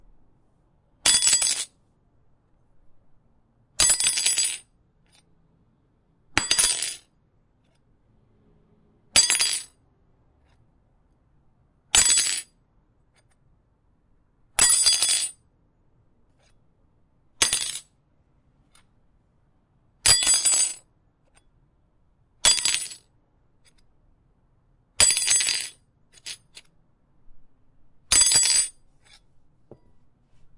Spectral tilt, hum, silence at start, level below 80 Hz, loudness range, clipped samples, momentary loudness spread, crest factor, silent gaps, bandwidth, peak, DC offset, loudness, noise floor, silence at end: 1.5 dB/octave; none; 1.05 s; -54 dBFS; 4 LU; under 0.1%; 20 LU; 26 dB; none; 12 kHz; -2 dBFS; under 0.1%; -19 LUFS; -65 dBFS; 0.1 s